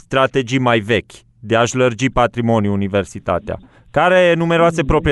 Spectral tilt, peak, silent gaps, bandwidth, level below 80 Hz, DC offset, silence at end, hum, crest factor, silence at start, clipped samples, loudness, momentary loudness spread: -5.5 dB/octave; -2 dBFS; none; 11.5 kHz; -34 dBFS; under 0.1%; 0 s; none; 14 dB; 0.1 s; under 0.1%; -16 LUFS; 8 LU